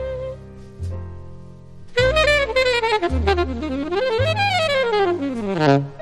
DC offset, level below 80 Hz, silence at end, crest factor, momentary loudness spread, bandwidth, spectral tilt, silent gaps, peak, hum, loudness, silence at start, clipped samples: under 0.1%; -34 dBFS; 0 s; 18 dB; 16 LU; 13 kHz; -5.5 dB/octave; none; -4 dBFS; none; -19 LUFS; 0 s; under 0.1%